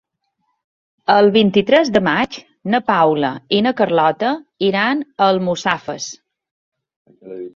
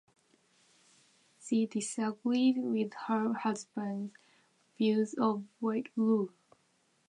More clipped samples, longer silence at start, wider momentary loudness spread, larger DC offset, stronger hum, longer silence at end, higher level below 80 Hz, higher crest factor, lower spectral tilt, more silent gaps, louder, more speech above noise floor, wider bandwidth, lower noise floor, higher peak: neither; second, 1.1 s vs 1.4 s; first, 13 LU vs 9 LU; neither; neither; second, 0.05 s vs 0.8 s; first, -58 dBFS vs -88 dBFS; about the same, 16 dB vs 18 dB; about the same, -5 dB/octave vs -5.5 dB/octave; first, 6.51-6.72 s, 6.96-7.05 s vs none; first, -16 LUFS vs -33 LUFS; first, 54 dB vs 41 dB; second, 7.6 kHz vs 11 kHz; about the same, -70 dBFS vs -73 dBFS; first, 0 dBFS vs -16 dBFS